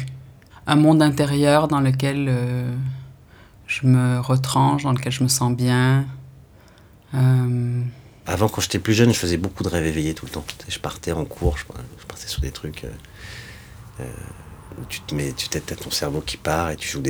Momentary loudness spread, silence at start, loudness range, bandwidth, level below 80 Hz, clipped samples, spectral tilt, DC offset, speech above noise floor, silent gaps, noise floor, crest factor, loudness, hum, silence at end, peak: 20 LU; 0 s; 11 LU; over 20 kHz; -40 dBFS; under 0.1%; -5.5 dB/octave; under 0.1%; 28 dB; none; -49 dBFS; 20 dB; -21 LUFS; none; 0 s; -2 dBFS